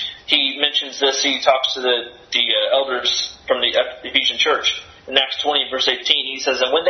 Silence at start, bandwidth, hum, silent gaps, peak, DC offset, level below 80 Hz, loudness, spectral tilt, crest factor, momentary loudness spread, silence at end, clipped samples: 0 s; 10.5 kHz; none; none; 0 dBFS; under 0.1%; -58 dBFS; -17 LUFS; 0 dB/octave; 20 dB; 5 LU; 0 s; under 0.1%